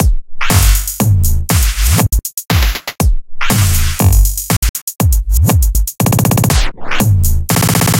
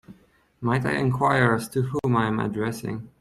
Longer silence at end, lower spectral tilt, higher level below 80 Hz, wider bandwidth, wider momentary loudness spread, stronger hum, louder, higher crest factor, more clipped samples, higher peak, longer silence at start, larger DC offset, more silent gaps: about the same, 0 s vs 0.1 s; second, -4.5 dB/octave vs -7 dB/octave; first, -14 dBFS vs -54 dBFS; first, 17.5 kHz vs 13.5 kHz; second, 5 LU vs 10 LU; neither; first, -13 LUFS vs -24 LUFS; second, 10 dB vs 18 dB; neither; first, 0 dBFS vs -6 dBFS; about the same, 0 s vs 0.1 s; neither; first, 4.57-4.62 s, 4.69-4.74 s, 4.82-4.87 s vs none